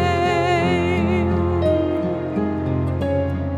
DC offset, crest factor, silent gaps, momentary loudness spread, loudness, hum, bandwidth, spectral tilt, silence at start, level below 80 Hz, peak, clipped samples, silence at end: under 0.1%; 12 dB; none; 5 LU; -20 LUFS; none; 10.5 kHz; -7.5 dB/octave; 0 s; -36 dBFS; -8 dBFS; under 0.1%; 0 s